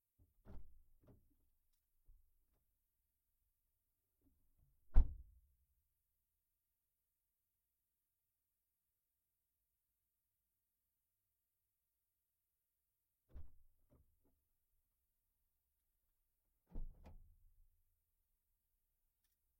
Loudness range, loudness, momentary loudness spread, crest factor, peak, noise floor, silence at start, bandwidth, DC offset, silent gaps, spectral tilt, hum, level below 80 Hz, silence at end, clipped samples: 17 LU; -43 LUFS; 24 LU; 30 dB; -18 dBFS; under -90 dBFS; 0.55 s; 1.7 kHz; under 0.1%; none; -8.5 dB/octave; none; -50 dBFS; 2.7 s; under 0.1%